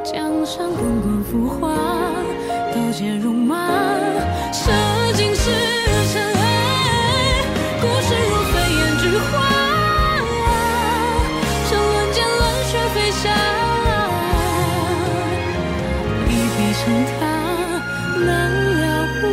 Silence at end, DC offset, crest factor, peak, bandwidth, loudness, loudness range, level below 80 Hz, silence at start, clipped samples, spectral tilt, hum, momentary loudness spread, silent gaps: 0 s; under 0.1%; 12 dB; -6 dBFS; 16 kHz; -18 LUFS; 3 LU; -30 dBFS; 0 s; under 0.1%; -4.5 dB/octave; none; 5 LU; none